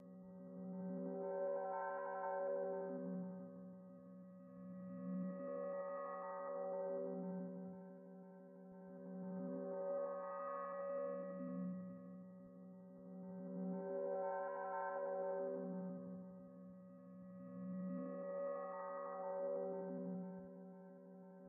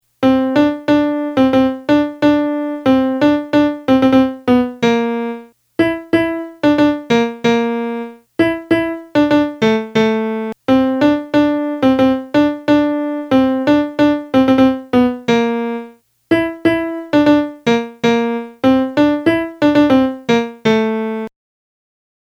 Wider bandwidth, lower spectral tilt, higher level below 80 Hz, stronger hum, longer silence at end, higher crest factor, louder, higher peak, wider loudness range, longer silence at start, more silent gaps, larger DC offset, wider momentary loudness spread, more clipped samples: second, 2.8 kHz vs 12 kHz; about the same, -5 dB/octave vs -6 dB/octave; second, under -90 dBFS vs -48 dBFS; neither; second, 0 s vs 1.05 s; about the same, 14 dB vs 14 dB; second, -47 LUFS vs -15 LUFS; second, -34 dBFS vs 0 dBFS; about the same, 4 LU vs 2 LU; second, 0 s vs 0.2 s; neither; neither; first, 15 LU vs 7 LU; neither